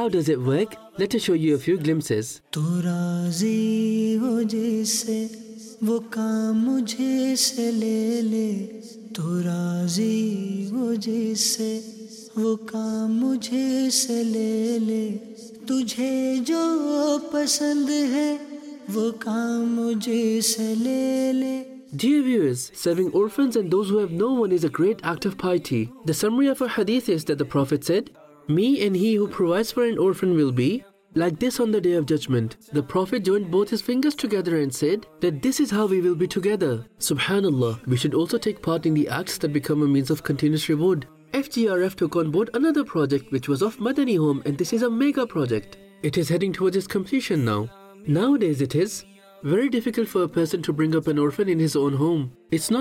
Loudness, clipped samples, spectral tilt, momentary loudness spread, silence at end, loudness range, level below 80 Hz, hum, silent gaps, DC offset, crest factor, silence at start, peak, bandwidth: -23 LUFS; under 0.1%; -5.5 dB/octave; 6 LU; 0 s; 2 LU; -60 dBFS; none; none; under 0.1%; 14 dB; 0 s; -8 dBFS; 16.5 kHz